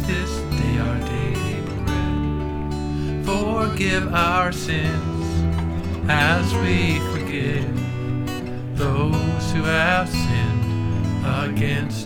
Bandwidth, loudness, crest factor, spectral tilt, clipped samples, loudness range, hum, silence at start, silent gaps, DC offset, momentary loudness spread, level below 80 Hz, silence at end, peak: 17.5 kHz; -22 LUFS; 18 dB; -6 dB/octave; under 0.1%; 3 LU; none; 0 s; none; under 0.1%; 7 LU; -32 dBFS; 0 s; -2 dBFS